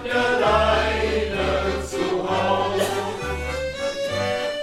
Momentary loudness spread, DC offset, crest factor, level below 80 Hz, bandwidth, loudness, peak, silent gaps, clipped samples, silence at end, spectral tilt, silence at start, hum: 8 LU; under 0.1%; 16 dB; -36 dBFS; 16 kHz; -22 LUFS; -6 dBFS; none; under 0.1%; 0 s; -4.5 dB/octave; 0 s; none